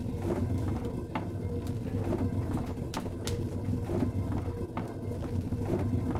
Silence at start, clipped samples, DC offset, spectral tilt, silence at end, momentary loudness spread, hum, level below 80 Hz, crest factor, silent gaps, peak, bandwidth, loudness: 0 s; under 0.1%; under 0.1%; -7.5 dB/octave; 0 s; 5 LU; none; -44 dBFS; 16 dB; none; -16 dBFS; 15 kHz; -33 LUFS